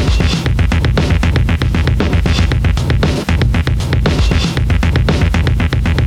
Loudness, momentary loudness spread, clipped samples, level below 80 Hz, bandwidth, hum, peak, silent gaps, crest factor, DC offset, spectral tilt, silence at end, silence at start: -14 LUFS; 1 LU; under 0.1%; -16 dBFS; 13 kHz; none; 0 dBFS; none; 12 dB; under 0.1%; -6 dB/octave; 0 s; 0 s